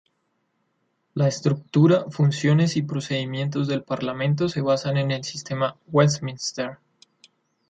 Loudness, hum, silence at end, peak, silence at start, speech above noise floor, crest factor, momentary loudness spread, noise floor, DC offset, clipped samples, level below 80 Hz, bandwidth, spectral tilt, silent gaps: -23 LUFS; none; 0.95 s; -6 dBFS; 1.15 s; 50 dB; 18 dB; 9 LU; -72 dBFS; under 0.1%; under 0.1%; -62 dBFS; 9 kHz; -6 dB/octave; none